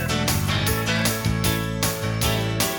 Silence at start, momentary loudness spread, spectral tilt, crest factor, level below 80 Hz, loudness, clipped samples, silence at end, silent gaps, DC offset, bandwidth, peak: 0 s; 2 LU; -4 dB/octave; 14 dB; -36 dBFS; -22 LUFS; under 0.1%; 0 s; none; under 0.1%; 19.5 kHz; -8 dBFS